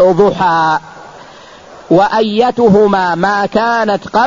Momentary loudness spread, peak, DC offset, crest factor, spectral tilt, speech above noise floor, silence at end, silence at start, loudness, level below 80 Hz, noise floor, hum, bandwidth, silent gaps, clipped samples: 5 LU; 0 dBFS; 0.2%; 12 dB; -6.5 dB/octave; 25 dB; 0 s; 0 s; -11 LUFS; -44 dBFS; -36 dBFS; none; 7.6 kHz; none; under 0.1%